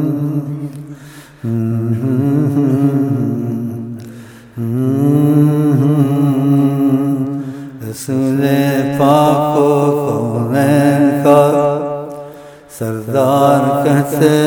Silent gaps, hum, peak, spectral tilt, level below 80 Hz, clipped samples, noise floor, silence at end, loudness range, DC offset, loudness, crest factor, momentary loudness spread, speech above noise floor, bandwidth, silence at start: none; none; 0 dBFS; -7.5 dB/octave; -54 dBFS; under 0.1%; -36 dBFS; 0 s; 5 LU; under 0.1%; -14 LUFS; 14 dB; 16 LU; 23 dB; 18.5 kHz; 0 s